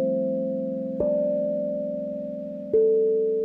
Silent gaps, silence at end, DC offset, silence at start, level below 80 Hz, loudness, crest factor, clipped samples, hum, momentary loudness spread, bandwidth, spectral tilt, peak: none; 0 s; under 0.1%; 0 s; -60 dBFS; -25 LUFS; 12 dB; under 0.1%; none; 11 LU; 2.1 kHz; -12 dB/octave; -12 dBFS